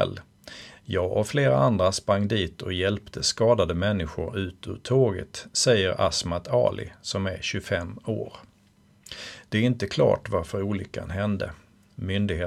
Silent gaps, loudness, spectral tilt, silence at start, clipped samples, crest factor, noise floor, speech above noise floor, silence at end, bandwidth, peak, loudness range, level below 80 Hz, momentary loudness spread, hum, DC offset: none; -25 LUFS; -5 dB/octave; 0 s; under 0.1%; 18 dB; -59 dBFS; 34 dB; 0 s; 13.5 kHz; -8 dBFS; 5 LU; -48 dBFS; 15 LU; none; under 0.1%